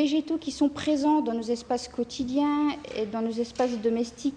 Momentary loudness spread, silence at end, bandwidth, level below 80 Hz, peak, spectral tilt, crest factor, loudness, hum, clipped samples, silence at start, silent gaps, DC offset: 7 LU; 0 s; 10 kHz; -58 dBFS; -14 dBFS; -4.5 dB/octave; 14 dB; -27 LUFS; none; under 0.1%; 0 s; none; under 0.1%